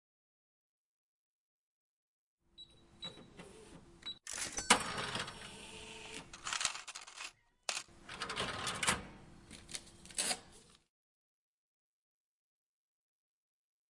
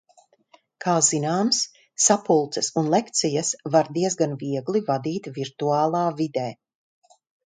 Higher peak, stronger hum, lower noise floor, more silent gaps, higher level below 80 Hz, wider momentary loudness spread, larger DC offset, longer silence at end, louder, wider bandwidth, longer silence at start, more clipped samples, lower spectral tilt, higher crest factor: second, -10 dBFS vs -4 dBFS; neither; about the same, -62 dBFS vs -59 dBFS; neither; about the same, -66 dBFS vs -70 dBFS; first, 21 LU vs 10 LU; neither; first, 3.15 s vs 0.95 s; second, -39 LUFS vs -23 LUFS; first, 11.5 kHz vs 9.8 kHz; first, 2.6 s vs 0.8 s; neither; second, -1 dB/octave vs -4 dB/octave; first, 36 dB vs 20 dB